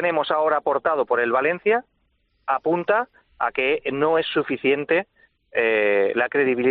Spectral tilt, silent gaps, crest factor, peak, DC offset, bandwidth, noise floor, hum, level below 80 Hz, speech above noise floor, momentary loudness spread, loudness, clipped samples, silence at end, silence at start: -2.5 dB/octave; none; 14 dB; -6 dBFS; under 0.1%; 4.7 kHz; -67 dBFS; none; -64 dBFS; 46 dB; 6 LU; -21 LUFS; under 0.1%; 0 s; 0 s